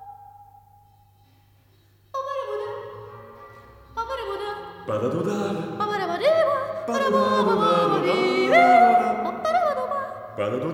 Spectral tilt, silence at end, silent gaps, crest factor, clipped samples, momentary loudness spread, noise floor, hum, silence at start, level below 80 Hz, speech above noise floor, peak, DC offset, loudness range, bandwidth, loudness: -5.5 dB/octave; 0 s; none; 18 dB; under 0.1%; 17 LU; -58 dBFS; none; 0 s; -60 dBFS; 35 dB; -6 dBFS; under 0.1%; 16 LU; 16 kHz; -22 LUFS